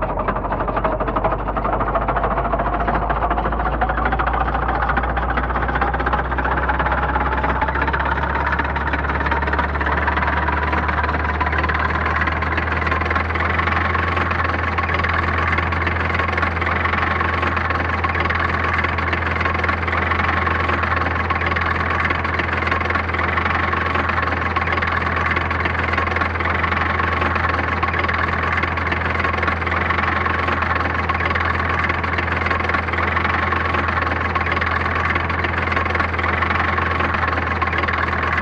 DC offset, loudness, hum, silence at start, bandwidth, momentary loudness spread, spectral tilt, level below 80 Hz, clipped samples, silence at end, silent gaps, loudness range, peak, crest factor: under 0.1%; -19 LUFS; none; 0 s; 7.2 kHz; 2 LU; -7 dB/octave; -28 dBFS; under 0.1%; 0 s; none; 1 LU; -4 dBFS; 14 dB